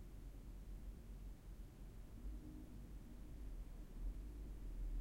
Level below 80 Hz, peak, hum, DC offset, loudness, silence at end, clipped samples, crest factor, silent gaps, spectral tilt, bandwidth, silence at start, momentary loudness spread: -52 dBFS; -38 dBFS; none; under 0.1%; -56 LUFS; 0 s; under 0.1%; 14 dB; none; -7 dB/octave; 16 kHz; 0 s; 6 LU